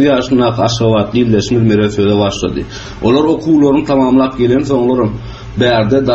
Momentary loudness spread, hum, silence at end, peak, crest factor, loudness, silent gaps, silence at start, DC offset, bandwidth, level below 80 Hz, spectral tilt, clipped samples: 8 LU; none; 0 s; 0 dBFS; 12 dB; -12 LUFS; none; 0 s; under 0.1%; 8 kHz; -34 dBFS; -6.5 dB/octave; under 0.1%